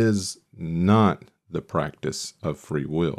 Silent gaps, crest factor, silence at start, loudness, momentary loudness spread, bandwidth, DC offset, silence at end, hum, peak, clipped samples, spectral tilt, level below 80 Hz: none; 18 dB; 0 s; -25 LUFS; 15 LU; 13.5 kHz; under 0.1%; 0 s; none; -8 dBFS; under 0.1%; -6 dB/octave; -52 dBFS